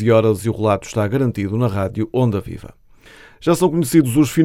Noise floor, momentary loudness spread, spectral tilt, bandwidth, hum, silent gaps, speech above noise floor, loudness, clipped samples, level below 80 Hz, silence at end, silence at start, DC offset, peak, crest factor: -45 dBFS; 8 LU; -7 dB/octave; 16.5 kHz; none; none; 28 dB; -18 LUFS; under 0.1%; -46 dBFS; 0 s; 0 s; under 0.1%; -2 dBFS; 16 dB